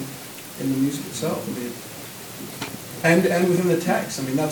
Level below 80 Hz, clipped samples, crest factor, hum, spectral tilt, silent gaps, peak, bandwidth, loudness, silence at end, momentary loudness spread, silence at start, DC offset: -64 dBFS; under 0.1%; 18 dB; none; -5 dB/octave; none; -4 dBFS; 19.5 kHz; -23 LUFS; 0 s; 17 LU; 0 s; under 0.1%